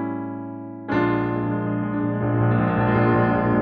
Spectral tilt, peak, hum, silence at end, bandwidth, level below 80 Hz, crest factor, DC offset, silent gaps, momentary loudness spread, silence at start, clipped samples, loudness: -11 dB/octave; -6 dBFS; none; 0 s; 4.8 kHz; -44 dBFS; 16 dB; under 0.1%; none; 12 LU; 0 s; under 0.1%; -22 LUFS